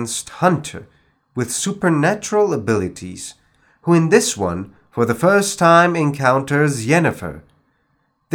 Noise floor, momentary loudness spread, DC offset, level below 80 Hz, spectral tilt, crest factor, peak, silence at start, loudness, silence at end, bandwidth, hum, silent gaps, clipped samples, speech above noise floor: -65 dBFS; 18 LU; under 0.1%; -56 dBFS; -5 dB/octave; 18 dB; 0 dBFS; 0 s; -17 LUFS; 0 s; 18.5 kHz; none; none; under 0.1%; 48 dB